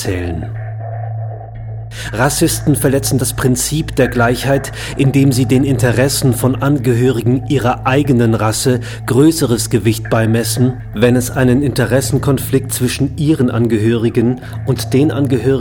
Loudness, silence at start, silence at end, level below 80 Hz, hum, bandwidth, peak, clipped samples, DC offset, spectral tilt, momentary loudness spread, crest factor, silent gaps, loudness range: -14 LUFS; 0 s; 0 s; -34 dBFS; none; 19 kHz; 0 dBFS; under 0.1%; under 0.1%; -5.5 dB/octave; 11 LU; 12 dB; none; 2 LU